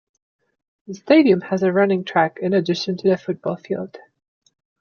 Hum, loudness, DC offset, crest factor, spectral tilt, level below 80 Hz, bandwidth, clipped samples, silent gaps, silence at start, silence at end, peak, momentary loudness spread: none; -19 LUFS; under 0.1%; 18 dB; -7 dB/octave; -68 dBFS; 7 kHz; under 0.1%; none; 0.9 s; 0.85 s; -2 dBFS; 13 LU